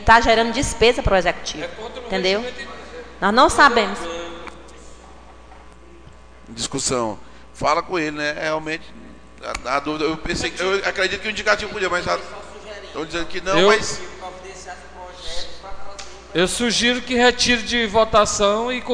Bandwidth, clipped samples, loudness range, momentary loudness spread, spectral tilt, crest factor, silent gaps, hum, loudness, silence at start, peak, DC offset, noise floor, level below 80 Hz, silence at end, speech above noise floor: 10 kHz; under 0.1%; 7 LU; 21 LU; -3 dB/octave; 20 dB; none; none; -19 LUFS; 0 s; 0 dBFS; 0.5%; -44 dBFS; -38 dBFS; 0 s; 25 dB